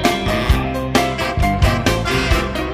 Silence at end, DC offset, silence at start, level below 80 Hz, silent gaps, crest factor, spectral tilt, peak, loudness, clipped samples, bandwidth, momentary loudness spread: 0 s; under 0.1%; 0 s; -22 dBFS; none; 16 dB; -5 dB/octave; 0 dBFS; -17 LUFS; under 0.1%; 15.5 kHz; 3 LU